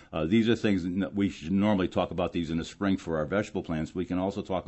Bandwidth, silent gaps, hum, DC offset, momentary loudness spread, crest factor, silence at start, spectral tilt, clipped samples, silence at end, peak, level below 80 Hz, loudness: 8.4 kHz; none; none; under 0.1%; 7 LU; 16 dB; 0 s; -7 dB/octave; under 0.1%; 0.05 s; -12 dBFS; -52 dBFS; -29 LUFS